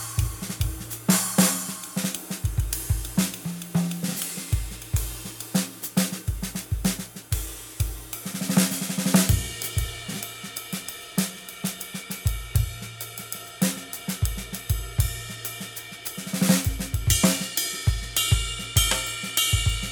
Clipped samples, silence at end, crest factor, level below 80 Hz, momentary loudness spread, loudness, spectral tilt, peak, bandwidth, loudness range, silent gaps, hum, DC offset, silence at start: under 0.1%; 0 s; 24 dB; -34 dBFS; 12 LU; -26 LUFS; -3.5 dB/octave; -2 dBFS; over 20 kHz; 6 LU; none; none; under 0.1%; 0 s